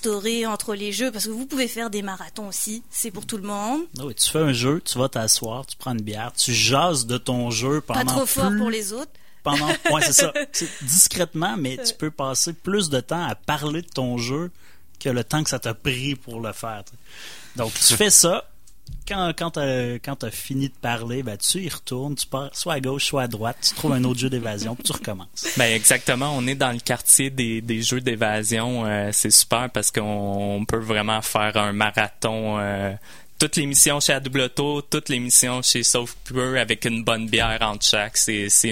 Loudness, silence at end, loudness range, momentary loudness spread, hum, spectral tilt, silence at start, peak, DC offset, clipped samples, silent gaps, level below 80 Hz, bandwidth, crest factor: -21 LUFS; 0 s; 7 LU; 14 LU; none; -2.5 dB/octave; 0 s; 0 dBFS; 0.9%; under 0.1%; none; -48 dBFS; 16.5 kHz; 22 dB